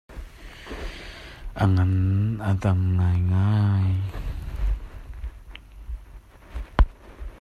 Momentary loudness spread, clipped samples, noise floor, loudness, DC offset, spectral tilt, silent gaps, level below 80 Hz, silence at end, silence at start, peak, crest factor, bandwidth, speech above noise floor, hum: 21 LU; under 0.1%; -45 dBFS; -24 LUFS; under 0.1%; -8.5 dB/octave; none; -32 dBFS; 0.05 s; 0.1 s; -4 dBFS; 20 dB; 6.6 kHz; 25 dB; none